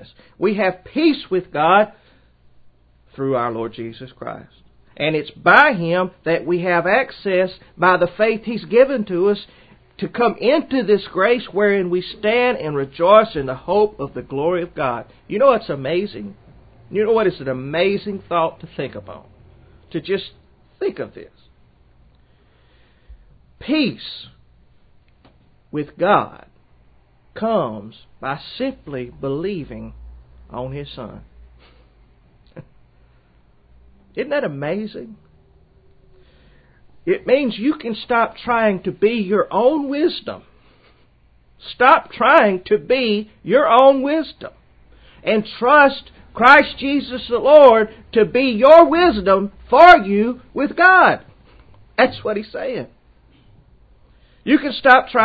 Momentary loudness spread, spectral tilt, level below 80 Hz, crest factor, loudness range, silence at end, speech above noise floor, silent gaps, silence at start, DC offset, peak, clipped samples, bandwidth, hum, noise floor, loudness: 20 LU; -7.5 dB/octave; -50 dBFS; 18 dB; 16 LU; 0 s; 37 dB; none; 0 s; under 0.1%; 0 dBFS; under 0.1%; 8 kHz; none; -54 dBFS; -16 LUFS